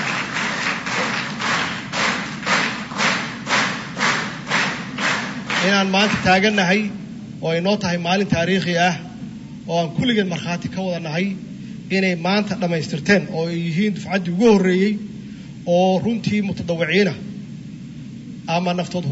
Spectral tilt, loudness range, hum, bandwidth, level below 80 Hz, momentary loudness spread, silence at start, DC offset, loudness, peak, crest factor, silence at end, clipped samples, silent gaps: -5 dB/octave; 3 LU; none; 8 kHz; -54 dBFS; 17 LU; 0 s; under 0.1%; -20 LUFS; -2 dBFS; 18 dB; 0 s; under 0.1%; none